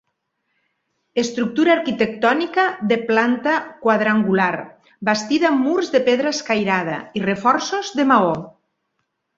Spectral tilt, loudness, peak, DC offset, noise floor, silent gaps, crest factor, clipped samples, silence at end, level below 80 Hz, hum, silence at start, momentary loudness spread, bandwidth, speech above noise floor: -5 dB/octave; -19 LUFS; -2 dBFS; under 0.1%; -73 dBFS; none; 18 dB; under 0.1%; 0.9 s; -62 dBFS; none; 1.15 s; 6 LU; 7.8 kHz; 55 dB